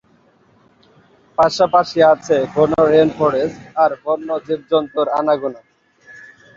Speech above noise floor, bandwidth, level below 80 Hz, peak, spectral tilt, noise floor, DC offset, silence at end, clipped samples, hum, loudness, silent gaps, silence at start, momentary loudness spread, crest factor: 39 dB; 7.6 kHz; -54 dBFS; -2 dBFS; -6 dB/octave; -54 dBFS; under 0.1%; 0.35 s; under 0.1%; none; -16 LUFS; none; 1.4 s; 9 LU; 16 dB